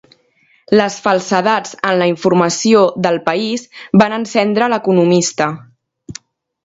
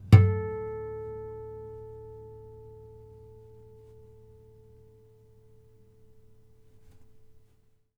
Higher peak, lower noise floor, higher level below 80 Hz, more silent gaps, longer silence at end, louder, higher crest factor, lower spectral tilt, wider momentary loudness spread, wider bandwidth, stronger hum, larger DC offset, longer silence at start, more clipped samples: first, 0 dBFS vs -4 dBFS; second, -55 dBFS vs -64 dBFS; second, -56 dBFS vs -50 dBFS; neither; second, 0.5 s vs 5.6 s; first, -14 LUFS vs -28 LUFS; second, 14 dB vs 28 dB; second, -5 dB/octave vs -9 dB/octave; second, 11 LU vs 26 LU; first, 8 kHz vs 5.6 kHz; neither; neither; first, 0.7 s vs 0.05 s; neither